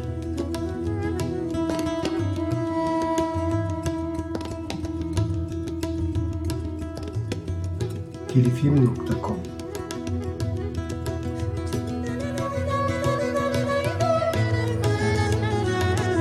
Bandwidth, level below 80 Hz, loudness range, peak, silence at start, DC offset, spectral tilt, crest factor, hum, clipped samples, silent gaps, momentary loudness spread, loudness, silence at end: 13.5 kHz; -40 dBFS; 5 LU; -6 dBFS; 0 s; under 0.1%; -7 dB/octave; 18 dB; none; under 0.1%; none; 8 LU; -26 LUFS; 0 s